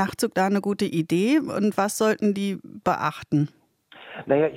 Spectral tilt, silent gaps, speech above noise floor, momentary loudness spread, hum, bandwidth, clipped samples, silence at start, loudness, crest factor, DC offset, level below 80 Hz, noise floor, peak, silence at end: -5.5 dB/octave; none; 26 dB; 7 LU; none; 16.5 kHz; under 0.1%; 0 s; -24 LUFS; 16 dB; under 0.1%; -66 dBFS; -49 dBFS; -8 dBFS; 0 s